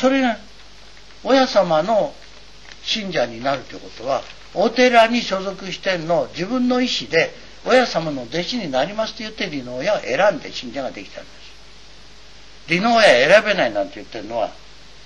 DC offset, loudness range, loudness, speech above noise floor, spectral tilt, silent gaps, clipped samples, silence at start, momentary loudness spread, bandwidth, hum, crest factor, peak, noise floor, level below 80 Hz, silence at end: 0.9%; 5 LU; -19 LUFS; 26 dB; -4 dB/octave; none; under 0.1%; 0 s; 15 LU; 11 kHz; none; 18 dB; -2 dBFS; -45 dBFS; -50 dBFS; 0.5 s